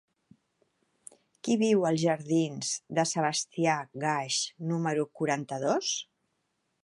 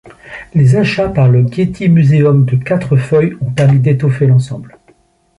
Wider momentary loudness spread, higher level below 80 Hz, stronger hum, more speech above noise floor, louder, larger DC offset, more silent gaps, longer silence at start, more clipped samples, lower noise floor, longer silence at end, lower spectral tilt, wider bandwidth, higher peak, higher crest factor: about the same, 7 LU vs 8 LU; second, -78 dBFS vs -42 dBFS; neither; first, 49 dB vs 41 dB; second, -29 LUFS vs -11 LUFS; neither; neither; first, 1.45 s vs 0.25 s; neither; first, -78 dBFS vs -51 dBFS; about the same, 0.8 s vs 0.7 s; second, -4 dB/octave vs -8.5 dB/octave; about the same, 11.5 kHz vs 11 kHz; second, -12 dBFS vs 0 dBFS; first, 18 dB vs 10 dB